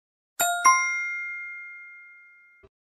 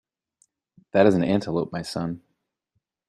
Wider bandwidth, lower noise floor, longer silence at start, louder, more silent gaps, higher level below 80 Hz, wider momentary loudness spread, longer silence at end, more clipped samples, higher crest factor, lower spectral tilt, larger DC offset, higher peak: first, 15 kHz vs 12.5 kHz; second, -54 dBFS vs -77 dBFS; second, 0.4 s vs 0.95 s; about the same, -23 LUFS vs -23 LUFS; neither; second, -74 dBFS vs -60 dBFS; first, 23 LU vs 13 LU; about the same, 0.85 s vs 0.9 s; neither; about the same, 22 dB vs 22 dB; second, 2 dB/octave vs -7 dB/octave; neither; about the same, -6 dBFS vs -4 dBFS